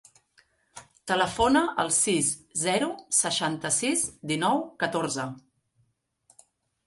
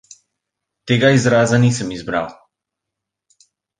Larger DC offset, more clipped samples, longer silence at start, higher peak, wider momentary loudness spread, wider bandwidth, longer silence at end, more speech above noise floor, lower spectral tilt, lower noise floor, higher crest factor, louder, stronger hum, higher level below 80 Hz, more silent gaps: neither; neither; about the same, 0.75 s vs 0.85 s; second, -8 dBFS vs 0 dBFS; second, 7 LU vs 10 LU; first, 12 kHz vs 9.8 kHz; about the same, 1.5 s vs 1.45 s; second, 45 dB vs 67 dB; second, -2.5 dB/octave vs -5.5 dB/octave; second, -71 dBFS vs -82 dBFS; about the same, 20 dB vs 18 dB; second, -25 LUFS vs -16 LUFS; neither; about the same, -56 dBFS vs -52 dBFS; neither